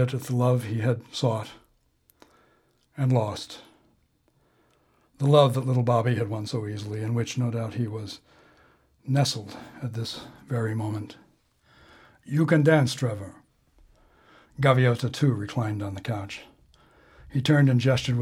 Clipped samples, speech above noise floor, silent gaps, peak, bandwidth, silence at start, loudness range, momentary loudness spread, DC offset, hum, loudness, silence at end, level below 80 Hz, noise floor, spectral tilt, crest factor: under 0.1%; 42 dB; none; -4 dBFS; 14.5 kHz; 0 s; 6 LU; 19 LU; under 0.1%; none; -25 LUFS; 0 s; -60 dBFS; -67 dBFS; -6.5 dB/octave; 22 dB